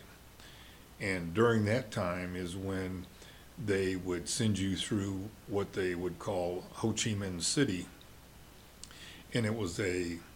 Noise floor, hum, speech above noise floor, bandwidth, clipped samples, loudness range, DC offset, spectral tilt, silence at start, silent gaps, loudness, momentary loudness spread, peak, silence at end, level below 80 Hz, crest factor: -55 dBFS; none; 21 dB; 17 kHz; under 0.1%; 2 LU; under 0.1%; -4.5 dB/octave; 0 s; none; -34 LUFS; 21 LU; -16 dBFS; 0 s; -58 dBFS; 20 dB